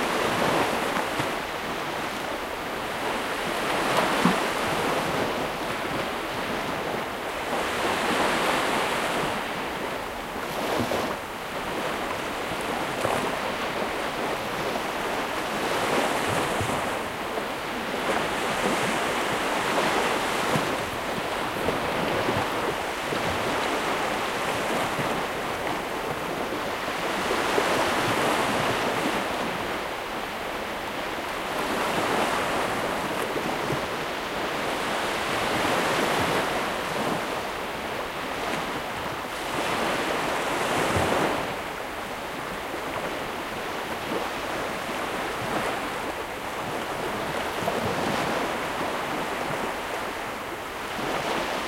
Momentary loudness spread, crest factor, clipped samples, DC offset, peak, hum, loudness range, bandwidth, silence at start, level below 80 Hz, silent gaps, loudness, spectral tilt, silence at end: 7 LU; 20 dB; under 0.1%; under 0.1%; -6 dBFS; none; 4 LU; 16 kHz; 0 s; -50 dBFS; none; -27 LUFS; -3.5 dB/octave; 0 s